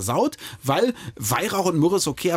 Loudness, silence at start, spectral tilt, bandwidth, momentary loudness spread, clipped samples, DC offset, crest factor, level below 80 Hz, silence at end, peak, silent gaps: -23 LUFS; 0 s; -4.5 dB/octave; 17 kHz; 6 LU; under 0.1%; under 0.1%; 14 dB; -56 dBFS; 0 s; -8 dBFS; none